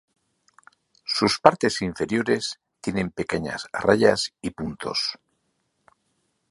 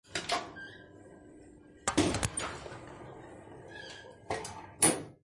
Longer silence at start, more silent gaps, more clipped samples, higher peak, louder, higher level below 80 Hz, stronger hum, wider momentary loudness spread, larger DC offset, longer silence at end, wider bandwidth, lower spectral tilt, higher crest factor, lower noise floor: first, 1.05 s vs 0.05 s; neither; neither; first, 0 dBFS vs -10 dBFS; first, -24 LUFS vs -32 LUFS; about the same, -54 dBFS vs -58 dBFS; neither; second, 13 LU vs 25 LU; neither; first, 1.35 s vs 0.1 s; about the same, 11.5 kHz vs 11.5 kHz; first, -4.5 dB/octave vs -3 dB/octave; about the same, 26 dB vs 26 dB; first, -73 dBFS vs -55 dBFS